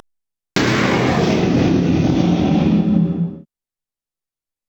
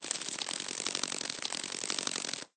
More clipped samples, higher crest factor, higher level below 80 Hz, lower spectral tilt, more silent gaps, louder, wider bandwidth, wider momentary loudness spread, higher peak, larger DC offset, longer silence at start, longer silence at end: neither; second, 14 dB vs 28 dB; first, -40 dBFS vs -80 dBFS; first, -6.5 dB/octave vs 0 dB/octave; neither; first, -16 LUFS vs -34 LUFS; first, 16.5 kHz vs 9.8 kHz; about the same, 5 LU vs 3 LU; first, -4 dBFS vs -10 dBFS; neither; first, 0.55 s vs 0 s; first, 1.25 s vs 0.1 s